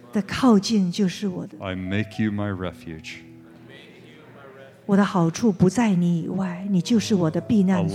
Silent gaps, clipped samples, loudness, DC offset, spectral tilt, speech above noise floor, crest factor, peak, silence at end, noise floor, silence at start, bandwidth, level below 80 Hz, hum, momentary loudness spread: none; under 0.1%; -22 LUFS; under 0.1%; -6.5 dB/octave; 25 dB; 16 dB; -6 dBFS; 0 s; -46 dBFS; 0.1 s; 12.5 kHz; -56 dBFS; none; 14 LU